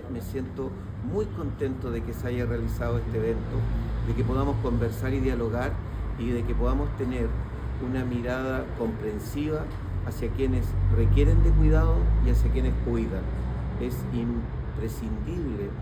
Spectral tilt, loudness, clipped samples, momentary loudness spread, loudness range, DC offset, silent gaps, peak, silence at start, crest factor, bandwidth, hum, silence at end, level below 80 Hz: -8.5 dB/octave; -28 LUFS; under 0.1%; 10 LU; 6 LU; under 0.1%; none; -10 dBFS; 0 s; 16 dB; 15 kHz; none; 0 s; -28 dBFS